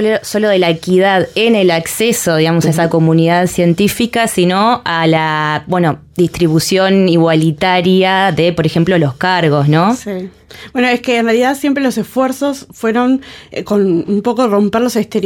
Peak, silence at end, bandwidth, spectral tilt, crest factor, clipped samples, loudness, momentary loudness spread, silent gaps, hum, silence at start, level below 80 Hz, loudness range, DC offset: -2 dBFS; 0 s; 17.5 kHz; -5.5 dB/octave; 10 dB; under 0.1%; -12 LUFS; 6 LU; none; none; 0 s; -46 dBFS; 3 LU; under 0.1%